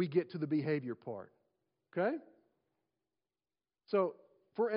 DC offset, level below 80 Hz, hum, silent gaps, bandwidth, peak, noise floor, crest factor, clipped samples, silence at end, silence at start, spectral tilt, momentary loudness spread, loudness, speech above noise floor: under 0.1%; -90 dBFS; none; none; 5.2 kHz; -20 dBFS; under -90 dBFS; 20 dB; under 0.1%; 0 s; 0 s; -6.5 dB/octave; 12 LU; -37 LUFS; over 55 dB